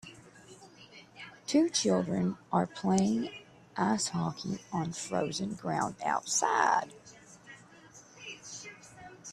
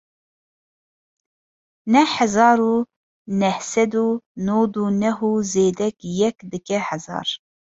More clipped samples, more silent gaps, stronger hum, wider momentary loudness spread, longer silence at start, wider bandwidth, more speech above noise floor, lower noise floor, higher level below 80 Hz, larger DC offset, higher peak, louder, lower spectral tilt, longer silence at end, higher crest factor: neither; second, none vs 2.96-3.25 s, 4.26-4.35 s; neither; first, 24 LU vs 11 LU; second, 0.05 s vs 1.85 s; first, 13 kHz vs 8 kHz; second, 25 dB vs over 71 dB; second, -55 dBFS vs under -90 dBFS; second, -70 dBFS vs -60 dBFS; neither; second, -12 dBFS vs -2 dBFS; second, -31 LUFS vs -20 LUFS; about the same, -4 dB/octave vs -5 dB/octave; second, 0 s vs 0.4 s; about the same, 22 dB vs 20 dB